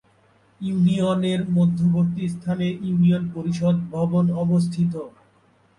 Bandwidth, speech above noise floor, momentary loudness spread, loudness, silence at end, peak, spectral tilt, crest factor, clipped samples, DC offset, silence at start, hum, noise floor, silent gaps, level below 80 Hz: 10.5 kHz; 38 dB; 8 LU; -22 LUFS; 0.7 s; -10 dBFS; -8.5 dB/octave; 12 dB; under 0.1%; under 0.1%; 0.6 s; none; -59 dBFS; none; -56 dBFS